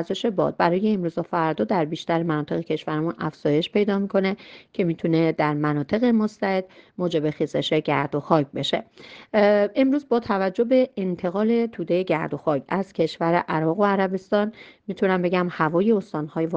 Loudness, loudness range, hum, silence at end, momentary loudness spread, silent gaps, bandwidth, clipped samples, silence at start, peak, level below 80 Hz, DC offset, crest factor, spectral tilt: -23 LUFS; 2 LU; none; 0 s; 6 LU; none; 8 kHz; under 0.1%; 0 s; -4 dBFS; -62 dBFS; under 0.1%; 20 dB; -7.5 dB/octave